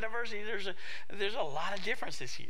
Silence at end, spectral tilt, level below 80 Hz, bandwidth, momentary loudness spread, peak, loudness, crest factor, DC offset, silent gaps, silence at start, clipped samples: 0 s; -3 dB/octave; -68 dBFS; 16 kHz; 6 LU; -18 dBFS; -37 LUFS; 18 dB; 3%; none; 0 s; under 0.1%